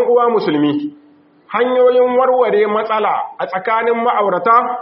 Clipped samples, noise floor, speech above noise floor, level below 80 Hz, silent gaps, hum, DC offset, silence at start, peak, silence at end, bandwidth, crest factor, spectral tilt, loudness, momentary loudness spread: under 0.1%; -48 dBFS; 34 dB; -68 dBFS; none; none; under 0.1%; 0 s; -2 dBFS; 0 s; 5.6 kHz; 12 dB; -3.5 dB/octave; -14 LUFS; 9 LU